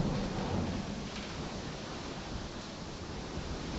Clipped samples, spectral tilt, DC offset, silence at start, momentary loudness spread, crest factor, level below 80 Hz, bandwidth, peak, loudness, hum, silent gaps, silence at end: under 0.1%; -5.5 dB/octave; under 0.1%; 0 s; 7 LU; 18 dB; -48 dBFS; 8.4 kHz; -20 dBFS; -39 LUFS; none; none; 0 s